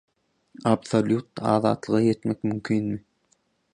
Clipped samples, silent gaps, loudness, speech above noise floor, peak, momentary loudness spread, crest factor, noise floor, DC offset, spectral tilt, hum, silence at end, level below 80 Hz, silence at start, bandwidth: under 0.1%; none; -25 LUFS; 45 dB; -6 dBFS; 6 LU; 20 dB; -68 dBFS; under 0.1%; -7 dB/octave; none; 0.75 s; -60 dBFS; 0.65 s; 10 kHz